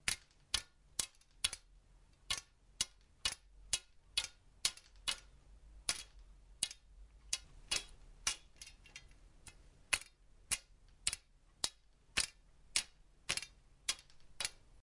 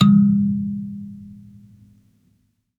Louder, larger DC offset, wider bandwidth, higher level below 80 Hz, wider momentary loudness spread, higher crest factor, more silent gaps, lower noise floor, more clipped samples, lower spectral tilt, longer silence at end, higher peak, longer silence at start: second, -41 LUFS vs -19 LUFS; neither; first, 11.5 kHz vs 4.3 kHz; about the same, -62 dBFS vs -58 dBFS; second, 17 LU vs 25 LU; first, 32 dB vs 18 dB; neither; about the same, -65 dBFS vs -65 dBFS; neither; second, 1 dB/octave vs -8 dB/octave; second, 0.1 s vs 1.45 s; second, -12 dBFS vs -2 dBFS; about the same, 0.05 s vs 0 s